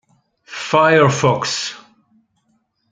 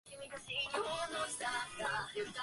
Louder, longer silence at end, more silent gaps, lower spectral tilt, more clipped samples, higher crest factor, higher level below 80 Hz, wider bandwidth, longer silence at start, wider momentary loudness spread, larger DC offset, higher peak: first, -15 LUFS vs -39 LUFS; first, 1.15 s vs 0 s; neither; first, -4.5 dB/octave vs -1.5 dB/octave; neither; about the same, 18 dB vs 16 dB; first, -58 dBFS vs -70 dBFS; second, 9.4 kHz vs 11.5 kHz; first, 0.5 s vs 0.05 s; first, 16 LU vs 4 LU; neither; first, 0 dBFS vs -24 dBFS